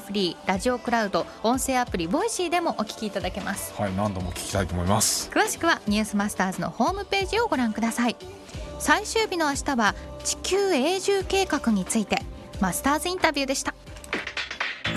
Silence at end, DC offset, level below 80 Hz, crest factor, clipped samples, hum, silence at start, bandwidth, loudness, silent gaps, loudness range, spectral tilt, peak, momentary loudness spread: 0 s; under 0.1%; -44 dBFS; 20 dB; under 0.1%; none; 0 s; 13 kHz; -25 LUFS; none; 2 LU; -3.5 dB/octave; -6 dBFS; 7 LU